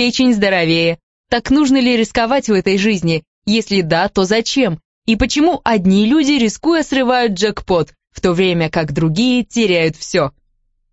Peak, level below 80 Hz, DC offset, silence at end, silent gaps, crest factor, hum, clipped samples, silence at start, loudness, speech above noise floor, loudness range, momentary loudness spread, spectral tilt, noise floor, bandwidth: 0 dBFS; -38 dBFS; under 0.1%; 0.65 s; 1.03-1.24 s, 3.27-3.42 s, 4.85-5.02 s; 14 dB; none; under 0.1%; 0 s; -15 LUFS; 48 dB; 1 LU; 6 LU; -5 dB/octave; -62 dBFS; 8.2 kHz